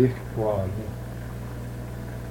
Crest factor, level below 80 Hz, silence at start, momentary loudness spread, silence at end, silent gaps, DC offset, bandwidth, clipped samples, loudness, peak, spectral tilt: 20 dB; -42 dBFS; 0 s; 9 LU; 0 s; none; under 0.1%; 17 kHz; under 0.1%; -31 LUFS; -8 dBFS; -8 dB/octave